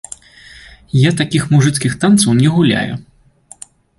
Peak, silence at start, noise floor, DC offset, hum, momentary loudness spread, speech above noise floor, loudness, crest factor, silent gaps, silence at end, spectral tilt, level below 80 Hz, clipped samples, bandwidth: 0 dBFS; 0.95 s; -44 dBFS; under 0.1%; none; 15 LU; 32 dB; -13 LUFS; 14 dB; none; 1 s; -5.5 dB/octave; -46 dBFS; under 0.1%; 11.5 kHz